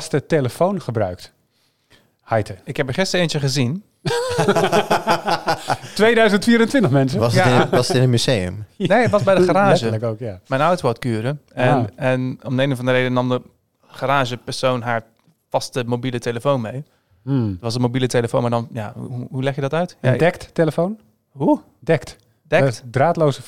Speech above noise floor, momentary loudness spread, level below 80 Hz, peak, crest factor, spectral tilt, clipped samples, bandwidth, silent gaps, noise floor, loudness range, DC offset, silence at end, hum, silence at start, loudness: 45 dB; 11 LU; -52 dBFS; -2 dBFS; 18 dB; -6 dB/octave; under 0.1%; 15.5 kHz; none; -64 dBFS; 7 LU; 0.6%; 0 s; none; 0 s; -19 LUFS